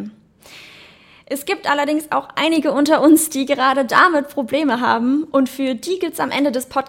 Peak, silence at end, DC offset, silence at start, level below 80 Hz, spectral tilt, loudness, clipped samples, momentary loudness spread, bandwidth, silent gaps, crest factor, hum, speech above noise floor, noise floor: 0 dBFS; 0 s; under 0.1%; 0 s; -62 dBFS; -3 dB/octave; -17 LUFS; under 0.1%; 9 LU; 17 kHz; none; 18 dB; none; 29 dB; -46 dBFS